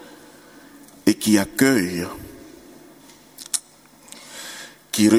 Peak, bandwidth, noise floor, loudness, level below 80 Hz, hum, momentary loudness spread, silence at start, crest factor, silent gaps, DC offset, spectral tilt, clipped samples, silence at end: 0 dBFS; 18.5 kHz; -50 dBFS; -21 LUFS; -56 dBFS; none; 24 LU; 1.05 s; 22 dB; none; under 0.1%; -4 dB/octave; under 0.1%; 0 s